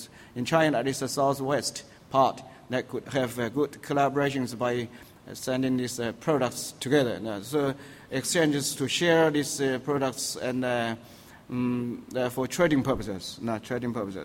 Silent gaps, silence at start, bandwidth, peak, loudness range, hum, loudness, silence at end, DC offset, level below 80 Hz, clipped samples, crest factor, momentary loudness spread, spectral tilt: none; 0 s; 16.5 kHz; -10 dBFS; 3 LU; none; -28 LUFS; 0 s; under 0.1%; -58 dBFS; under 0.1%; 18 dB; 10 LU; -4.5 dB/octave